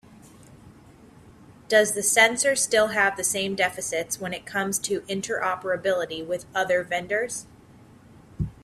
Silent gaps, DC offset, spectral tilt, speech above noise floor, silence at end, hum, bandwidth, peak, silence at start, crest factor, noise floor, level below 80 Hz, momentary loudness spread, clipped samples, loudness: none; under 0.1%; -2 dB/octave; 26 dB; 0.1 s; none; 15.5 kHz; -4 dBFS; 0.1 s; 22 dB; -51 dBFS; -52 dBFS; 11 LU; under 0.1%; -24 LUFS